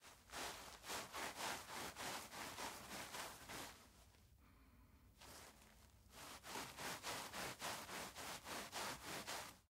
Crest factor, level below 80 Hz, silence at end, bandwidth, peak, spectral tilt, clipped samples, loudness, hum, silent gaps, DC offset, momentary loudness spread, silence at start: 20 dB; -72 dBFS; 0.05 s; 16 kHz; -34 dBFS; -1.5 dB/octave; under 0.1%; -50 LUFS; none; none; under 0.1%; 19 LU; 0 s